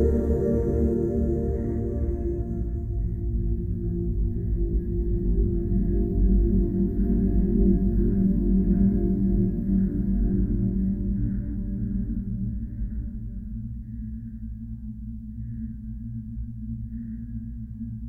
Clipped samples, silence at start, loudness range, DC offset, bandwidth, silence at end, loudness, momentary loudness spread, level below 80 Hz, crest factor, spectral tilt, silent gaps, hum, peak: under 0.1%; 0 s; 13 LU; under 0.1%; 2 kHz; 0 s; -27 LUFS; 13 LU; -28 dBFS; 14 dB; -13 dB/octave; none; none; -10 dBFS